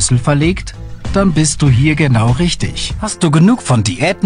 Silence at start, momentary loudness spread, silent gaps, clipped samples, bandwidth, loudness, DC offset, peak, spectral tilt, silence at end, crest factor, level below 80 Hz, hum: 0 s; 9 LU; none; under 0.1%; 11 kHz; -13 LUFS; under 0.1%; 0 dBFS; -5 dB/octave; 0 s; 12 dB; -28 dBFS; none